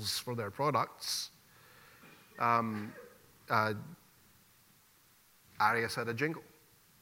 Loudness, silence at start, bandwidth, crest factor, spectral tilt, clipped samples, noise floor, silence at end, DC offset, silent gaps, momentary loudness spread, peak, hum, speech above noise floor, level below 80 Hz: -34 LUFS; 0 s; 16 kHz; 24 dB; -4 dB/octave; under 0.1%; -65 dBFS; 0.55 s; under 0.1%; none; 16 LU; -14 dBFS; none; 32 dB; -76 dBFS